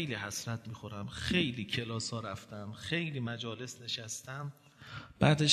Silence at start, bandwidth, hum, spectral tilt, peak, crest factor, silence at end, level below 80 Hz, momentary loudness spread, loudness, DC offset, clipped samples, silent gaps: 0 s; 13.5 kHz; none; -4.5 dB/octave; -10 dBFS; 26 dB; 0 s; -60 dBFS; 15 LU; -36 LUFS; under 0.1%; under 0.1%; none